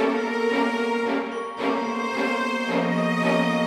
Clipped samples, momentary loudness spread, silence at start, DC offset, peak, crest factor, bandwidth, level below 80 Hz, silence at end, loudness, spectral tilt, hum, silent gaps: under 0.1%; 5 LU; 0 s; under 0.1%; -10 dBFS; 14 dB; 13.5 kHz; -70 dBFS; 0 s; -24 LUFS; -5.5 dB/octave; none; none